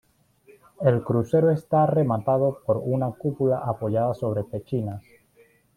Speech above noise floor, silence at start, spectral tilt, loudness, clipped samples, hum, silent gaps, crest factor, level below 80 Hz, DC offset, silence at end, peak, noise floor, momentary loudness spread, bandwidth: 36 dB; 0.8 s; -10 dB/octave; -24 LUFS; under 0.1%; none; none; 18 dB; -60 dBFS; under 0.1%; 0.75 s; -6 dBFS; -59 dBFS; 8 LU; 13.5 kHz